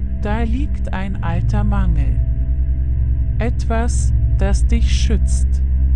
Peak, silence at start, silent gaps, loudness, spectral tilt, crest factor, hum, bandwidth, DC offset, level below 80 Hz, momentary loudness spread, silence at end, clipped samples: -4 dBFS; 0 s; none; -19 LUFS; -6.5 dB/octave; 12 dB; none; 9.8 kHz; under 0.1%; -16 dBFS; 5 LU; 0 s; under 0.1%